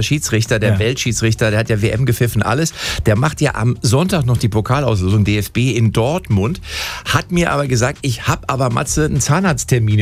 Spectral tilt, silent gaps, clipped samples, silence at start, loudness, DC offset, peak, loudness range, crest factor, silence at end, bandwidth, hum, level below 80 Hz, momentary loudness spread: -5 dB/octave; none; under 0.1%; 0 s; -16 LUFS; under 0.1%; -2 dBFS; 1 LU; 14 dB; 0 s; 15.5 kHz; none; -34 dBFS; 3 LU